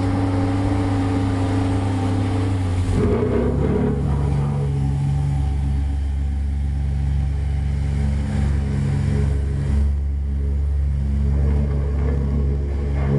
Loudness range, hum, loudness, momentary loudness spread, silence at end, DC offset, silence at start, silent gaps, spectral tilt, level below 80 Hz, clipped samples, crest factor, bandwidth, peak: 2 LU; none; -21 LUFS; 3 LU; 0 s; 0.5%; 0 s; none; -8.5 dB/octave; -24 dBFS; under 0.1%; 12 dB; 11 kHz; -6 dBFS